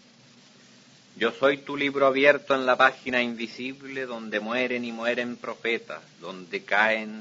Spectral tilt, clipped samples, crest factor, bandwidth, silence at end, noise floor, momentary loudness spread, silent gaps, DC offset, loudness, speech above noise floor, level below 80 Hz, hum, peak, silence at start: -4.5 dB/octave; under 0.1%; 24 dB; 7.8 kHz; 0 s; -54 dBFS; 14 LU; none; under 0.1%; -25 LUFS; 29 dB; -74 dBFS; none; -4 dBFS; 1.15 s